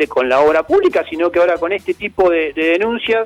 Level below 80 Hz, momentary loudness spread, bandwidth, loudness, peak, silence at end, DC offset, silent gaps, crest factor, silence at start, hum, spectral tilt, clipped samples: -48 dBFS; 6 LU; 12 kHz; -15 LUFS; -4 dBFS; 0 s; under 0.1%; none; 12 dB; 0 s; none; -5 dB/octave; under 0.1%